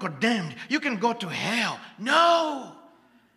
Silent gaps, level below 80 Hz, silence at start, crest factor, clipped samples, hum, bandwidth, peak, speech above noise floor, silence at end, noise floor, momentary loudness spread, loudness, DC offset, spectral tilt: none; -78 dBFS; 0 s; 22 dB; under 0.1%; none; 14 kHz; -6 dBFS; 32 dB; 0.55 s; -58 dBFS; 12 LU; -25 LUFS; under 0.1%; -4 dB/octave